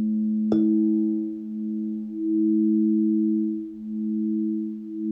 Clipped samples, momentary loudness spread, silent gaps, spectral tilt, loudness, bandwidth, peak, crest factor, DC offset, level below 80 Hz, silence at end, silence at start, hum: under 0.1%; 10 LU; none; -12 dB/octave; -24 LUFS; 3.7 kHz; -10 dBFS; 14 dB; under 0.1%; -66 dBFS; 0 s; 0 s; none